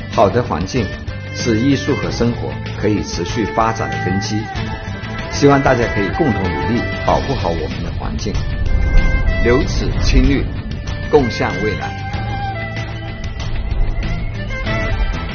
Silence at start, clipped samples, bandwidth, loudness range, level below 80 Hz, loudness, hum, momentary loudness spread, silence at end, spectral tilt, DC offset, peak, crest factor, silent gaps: 0 s; under 0.1%; 6.8 kHz; 4 LU; -22 dBFS; -18 LUFS; none; 10 LU; 0 s; -5.5 dB/octave; under 0.1%; 0 dBFS; 16 dB; none